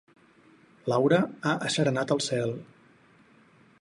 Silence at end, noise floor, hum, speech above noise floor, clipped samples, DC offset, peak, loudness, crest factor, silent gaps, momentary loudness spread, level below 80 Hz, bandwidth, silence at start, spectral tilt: 1.15 s; -59 dBFS; none; 33 dB; under 0.1%; under 0.1%; -10 dBFS; -27 LUFS; 18 dB; none; 10 LU; -72 dBFS; 11.5 kHz; 0.85 s; -5 dB/octave